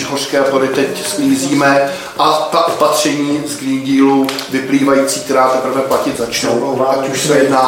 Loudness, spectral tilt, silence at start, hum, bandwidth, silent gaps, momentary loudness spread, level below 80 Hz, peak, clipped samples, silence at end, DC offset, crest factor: -13 LUFS; -4 dB/octave; 0 s; none; 16.5 kHz; none; 5 LU; -54 dBFS; 0 dBFS; under 0.1%; 0 s; under 0.1%; 12 dB